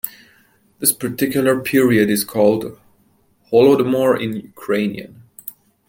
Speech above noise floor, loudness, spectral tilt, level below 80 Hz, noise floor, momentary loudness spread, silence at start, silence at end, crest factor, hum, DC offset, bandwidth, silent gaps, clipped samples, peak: 42 dB; -17 LUFS; -4.5 dB/octave; -58 dBFS; -58 dBFS; 19 LU; 0.05 s; 0.4 s; 18 dB; none; under 0.1%; 17 kHz; none; under 0.1%; 0 dBFS